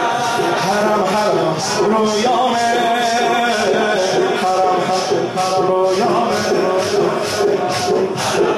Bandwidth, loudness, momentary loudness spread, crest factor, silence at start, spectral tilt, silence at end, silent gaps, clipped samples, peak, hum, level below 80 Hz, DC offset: 14.5 kHz; -16 LUFS; 2 LU; 12 dB; 0 s; -4 dB/octave; 0 s; none; under 0.1%; -4 dBFS; none; -54 dBFS; under 0.1%